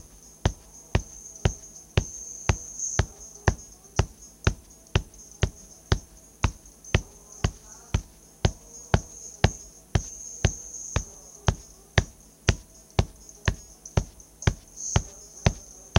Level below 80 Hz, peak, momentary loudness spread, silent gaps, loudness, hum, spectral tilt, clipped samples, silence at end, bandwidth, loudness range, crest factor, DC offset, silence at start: -36 dBFS; 0 dBFS; 14 LU; none; -30 LUFS; none; -4.5 dB/octave; under 0.1%; 0 s; 16.5 kHz; 1 LU; 28 dB; under 0.1%; 0.45 s